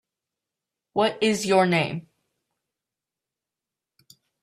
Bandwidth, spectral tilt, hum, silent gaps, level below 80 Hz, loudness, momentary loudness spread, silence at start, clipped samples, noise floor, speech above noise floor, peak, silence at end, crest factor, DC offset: 14 kHz; -4.5 dB/octave; none; none; -70 dBFS; -23 LUFS; 11 LU; 0.95 s; under 0.1%; -88 dBFS; 66 dB; -8 dBFS; 2.4 s; 20 dB; under 0.1%